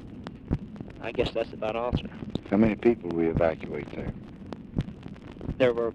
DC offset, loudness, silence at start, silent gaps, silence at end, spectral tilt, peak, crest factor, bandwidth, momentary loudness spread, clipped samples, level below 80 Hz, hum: under 0.1%; -29 LUFS; 0 s; none; 0 s; -8.5 dB/octave; -10 dBFS; 20 dB; 8.4 kHz; 18 LU; under 0.1%; -44 dBFS; none